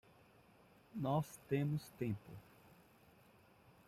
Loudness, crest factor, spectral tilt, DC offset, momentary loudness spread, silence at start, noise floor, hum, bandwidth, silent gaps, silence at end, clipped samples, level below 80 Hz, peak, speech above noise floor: -42 LUFS; 18 dB; -7.5 dB/octave; under 0.1%; 20 LU; 0.95 s; -67 dBFS; none; 15.5 kHz; none; 1.45 s; under 0.1%; -74 dBFS; -26 dBFS; 27 dB